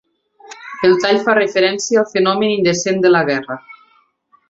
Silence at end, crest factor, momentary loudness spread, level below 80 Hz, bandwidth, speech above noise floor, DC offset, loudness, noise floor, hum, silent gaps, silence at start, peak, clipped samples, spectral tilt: 0.8 s; 14 dB; 14 LU; -60 dBFS; 7.8 kHz; 42 dB; under 0.1%; -15 LUFS; -57 dBFS; none; none; 0.45 s; -2 dBFS; under 0.1%; -4 dB/octave